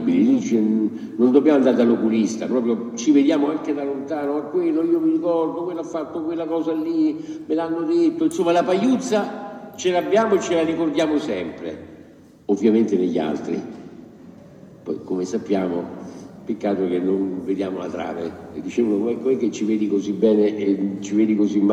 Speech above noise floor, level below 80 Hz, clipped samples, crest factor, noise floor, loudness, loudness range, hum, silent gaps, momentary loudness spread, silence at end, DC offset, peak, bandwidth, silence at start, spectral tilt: 26 dB; -68 dBFS; under 0.1%; 18 dB; -46 dBFS; -21 LUFS; 6 LU; none; none; 13 LU; 0 s; under 0.1%; -2 dBFS; 10.5 kHz; 0 s; -6 dB/octave